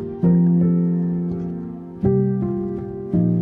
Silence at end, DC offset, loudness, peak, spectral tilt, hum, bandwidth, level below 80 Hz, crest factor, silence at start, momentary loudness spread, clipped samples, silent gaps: 0 s; under 0.1%; -20 LUFS; -6 dBFS; -13.5 dB/octave; none; 2.1 kHz; -46 dBFS; 14 dB; 0 s; 12 LU; under 0.1%; none